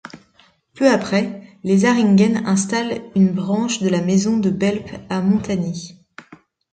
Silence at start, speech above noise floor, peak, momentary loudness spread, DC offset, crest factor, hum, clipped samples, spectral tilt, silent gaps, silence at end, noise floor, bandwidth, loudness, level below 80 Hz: 0.05 s; 38 dB; -2 dBFS; 12 LU; under 0.1%; 16 dB; none; under 0.1%; -6 dB/octave; none; 0.35 s; -56 dBFS; 9.2 kHz; -18 LUFS; -54 dBFS